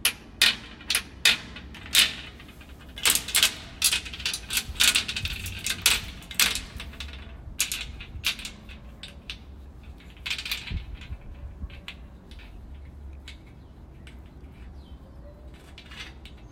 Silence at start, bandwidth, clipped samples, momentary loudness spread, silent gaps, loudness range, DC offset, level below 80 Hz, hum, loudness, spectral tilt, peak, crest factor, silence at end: 0 s; 16.5 kHz; under 0.1%; 26 LU; none; 22 LU; under 0.1%; -44 dBFS; none; -24 LUFS; 0 dB/octave; -2 dBFS; 28 dB; 0 s